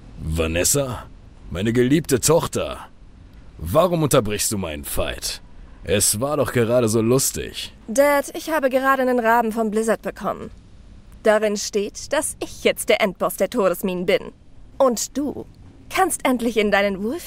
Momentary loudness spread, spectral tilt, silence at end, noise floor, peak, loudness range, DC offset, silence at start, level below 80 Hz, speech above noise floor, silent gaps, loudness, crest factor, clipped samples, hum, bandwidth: 11 LU; -4 dB/octave; 0 s; -43 dBFS; -4 dBFS; 3 LU; under 0.1%; 0 s; -40 dBFS; 23 dB; none; -20 LUFS; 18 dB; under 0.1%; none; 16 kHz